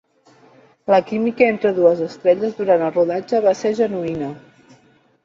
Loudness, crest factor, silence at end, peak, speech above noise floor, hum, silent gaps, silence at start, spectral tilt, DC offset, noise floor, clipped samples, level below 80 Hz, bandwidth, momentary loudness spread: -18 LUFS; 16 dB; 0.85 s; -2 dBFS; 37 dB; none; none; 0.9 s; -6.5 dB/octave; under 0.1%; -55 dBFS; under 0.1%; -62 dBFS; 7.4 kHz; 8 LU